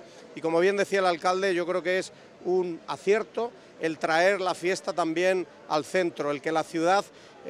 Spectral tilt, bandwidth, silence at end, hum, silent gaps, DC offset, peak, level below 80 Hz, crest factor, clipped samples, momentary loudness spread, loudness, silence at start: -4.5 dB/octave; 13 kHz; 0 s; none; none; under 0.1%; -10 dBFS; -76 dBFS; 18 dB; under 0.1%; 9 LU; -27 LUFS; 0 s